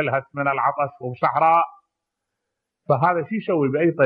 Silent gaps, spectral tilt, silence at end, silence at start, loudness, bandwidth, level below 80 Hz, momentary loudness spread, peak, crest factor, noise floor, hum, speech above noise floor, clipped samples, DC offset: none; -10 dB/octave; 0 s; 0 s; -21 LUFS; 5 kHz; -70 dBFS; 8 LU; -6 dBFS; 16 dB; -81 dBFS; none; 61 dB; under 0.1%; under 0.1%